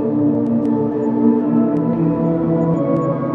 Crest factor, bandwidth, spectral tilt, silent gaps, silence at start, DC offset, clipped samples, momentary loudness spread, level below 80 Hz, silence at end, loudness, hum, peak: 12 dB; 3.5 kHz; -11.5 dB/octave; none; 0 s; under 0.1%; under 0.1%; 3 LU; -52 dBFS; 0 s; -17 LUFS; none; -4 dBFS